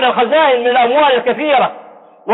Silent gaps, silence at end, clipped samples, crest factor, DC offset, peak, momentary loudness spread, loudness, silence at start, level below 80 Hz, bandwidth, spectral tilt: none; 0 s; under 0.1%; 10 dB; under 0.1%; -4 dBFS; 5 LU; -12 LUFS; 0 s; -60 dBFS; 4.1 kHz; -7.5 dB/octave